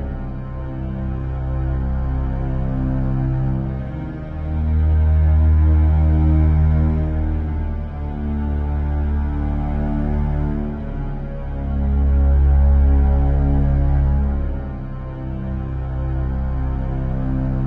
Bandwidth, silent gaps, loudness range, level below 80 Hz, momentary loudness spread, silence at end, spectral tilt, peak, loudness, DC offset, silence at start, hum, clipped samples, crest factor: 3.2 kHz; none; 6 LU; -20 dBFS; 12 LU; 0 s; -11.5 dB/octave; -6 dBFS; -20 LUFS; under 0.1%; 0 s; none; under 0.1%; 12 dB